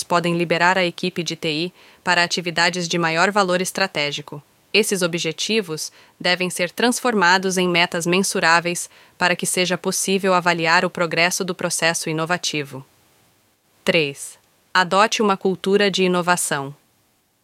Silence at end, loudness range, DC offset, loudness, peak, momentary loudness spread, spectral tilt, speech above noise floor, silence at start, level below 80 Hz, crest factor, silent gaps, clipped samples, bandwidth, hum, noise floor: 0.7 s; 3 LU; under 0.1%; -19 LUFS; -2 dBFS; 10 LU; -3 dB/octave; 43 dB; 0 s; -68 dBFS; 20 dB; none; under 0.1%; 16.5 kHz; none; -63 dBFS